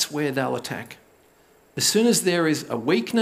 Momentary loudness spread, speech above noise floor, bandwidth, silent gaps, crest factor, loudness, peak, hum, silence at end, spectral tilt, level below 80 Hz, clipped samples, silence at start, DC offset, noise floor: 15 LU; 34 dB; 16 kHz; none; 16 dB; -22 LUFS; -8 dBFS; none; 0 s; -3.5 dB/octave; -70 dBFS; under 0.1%; 0 s; under 0.1%; -57 dBFS